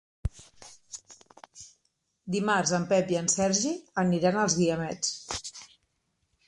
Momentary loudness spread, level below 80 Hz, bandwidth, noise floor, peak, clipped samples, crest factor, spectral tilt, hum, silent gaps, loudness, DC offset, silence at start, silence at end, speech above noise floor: 21 LU; -50 dBFS; 11.5 kHz; -76 dBFS; -10 dBFS; under 0.1%; 20 dB; -4 dB/octave; none; none; -27 LUFS; under 0.1%; 0.25 s; 0.85 s; 49 dB